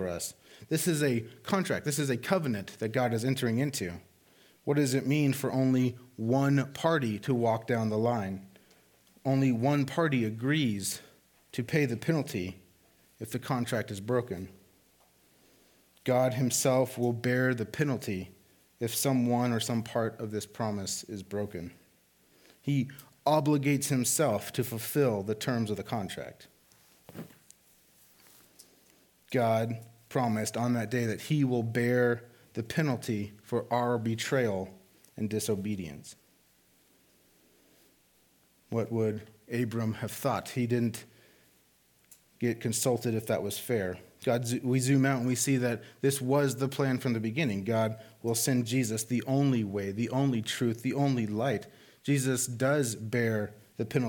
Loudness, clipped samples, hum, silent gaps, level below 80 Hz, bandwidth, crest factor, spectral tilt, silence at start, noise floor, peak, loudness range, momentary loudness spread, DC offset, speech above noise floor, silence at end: -30 LUFS; under 0.1%; none; none; -70 dBFS; 19 kHz; 20 dB; -5.5 dB/octave; 0 s; -66 dBFS; -10 dBFS; 7 LU; 11 LU; under 0.1%; 37 dB; 0 s